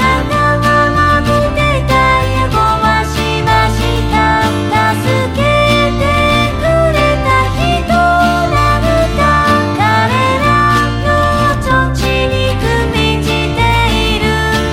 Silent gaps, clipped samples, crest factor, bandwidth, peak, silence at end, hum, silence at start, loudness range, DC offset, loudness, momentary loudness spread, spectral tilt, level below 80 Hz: none; under 0.1%; 10 dB; 16.5 kHz; 0 dBFS; 0 s; none; 0 s; 1 LU; under 0.1%; -11 LUFS; 3 LU; -5.5 dB/octave; -20 dBFS